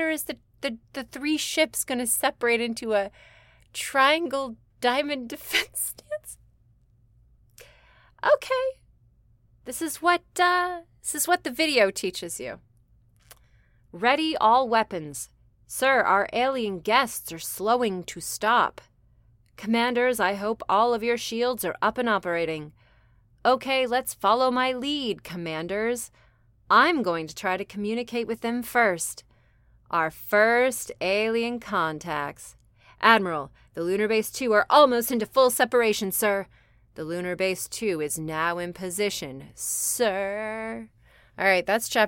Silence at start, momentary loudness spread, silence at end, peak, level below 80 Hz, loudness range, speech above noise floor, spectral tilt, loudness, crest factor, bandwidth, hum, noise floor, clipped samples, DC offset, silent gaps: 0 s; 13 LU; 0 s; -4 dBFS; -60 dBFS; 6 LU; 36 dB; -2.5 dB/octave; -25 LUFS; 22 dB; 17 kHz; none; -61 dBFS; under 0.1%; under 0.1%; none